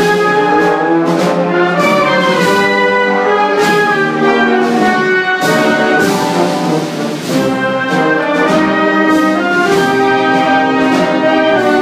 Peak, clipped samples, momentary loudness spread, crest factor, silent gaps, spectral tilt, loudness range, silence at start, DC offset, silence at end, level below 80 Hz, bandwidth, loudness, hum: 0 dBFS; under 0.1%; 3 LU; 10 dB; none; -5 dB/octave; 2 LU; 0 s; under 0.1%; 0 s; -52 dBFS; 15.5 kHz; -11 LUFS; none